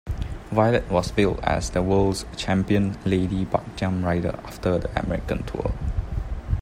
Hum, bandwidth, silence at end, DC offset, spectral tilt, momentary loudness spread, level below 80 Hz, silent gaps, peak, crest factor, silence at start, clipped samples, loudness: none; 15.5 kHz; 0 s; under 0.1%; -6.5 dB/octave; 9 LU; -34 dBFS; none; -4 dBFS; 20 dB; 0.05 s; under 0.1%; -24 LUFS